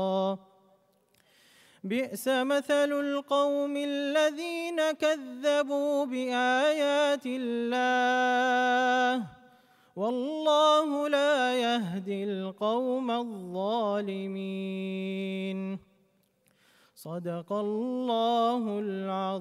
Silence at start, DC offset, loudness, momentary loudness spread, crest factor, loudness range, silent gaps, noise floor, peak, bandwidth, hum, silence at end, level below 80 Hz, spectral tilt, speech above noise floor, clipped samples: 0 s; under 0.1%; -28 LUFS; 10 LU; 18 dB; 7 LU; none; -69 dBFS; -12 dBFS; 15 kHz; none; 0 s; -82 dBFS; -4.5 dB/octave; 41 dB; under 0.1%